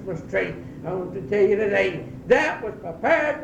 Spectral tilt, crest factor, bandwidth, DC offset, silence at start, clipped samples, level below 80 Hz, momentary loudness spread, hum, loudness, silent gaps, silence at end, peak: -6 dB/octave; 18 dB; 9 kHz; under 0.1%; 0 s; under 0.1%; -50 dBFS; 11 LU; none; -23 LUFS; none; 0 s; -6 dBFS